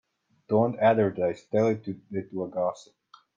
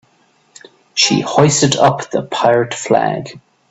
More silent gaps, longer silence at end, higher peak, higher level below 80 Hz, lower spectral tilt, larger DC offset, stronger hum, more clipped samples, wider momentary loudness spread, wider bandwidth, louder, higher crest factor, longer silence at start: neither; first, 0.55 s vs 0.3 s; second, -10 dBFS vs 0 dBFS; second, -70 dBFS vs -54 dBFS; first, -8 dB/octave vs -4 dB/octave; neither; neither; neither; about the same, 12 LU vs 10 LU; second, 7.6 kHz vs 8.4 kHz; second, -27 LUFS vs -14 LUFS; about the same, 18 dB vs 16 dB; second, 0.5 s vs 0.95 s